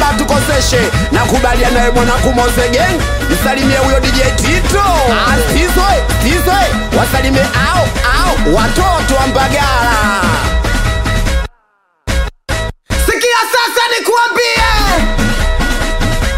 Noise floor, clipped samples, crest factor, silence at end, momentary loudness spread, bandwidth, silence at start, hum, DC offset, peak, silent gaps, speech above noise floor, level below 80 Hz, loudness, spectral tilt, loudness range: -57 dBFS; under 0.1%; 10 dB; 0 s; 5 LU; 16.5 kHz; 0 s; none; 0.6%; 0 dBFS; none; 46 dB; -16 dBFS; -11 LUFS; -4 dB/octave; 3 LU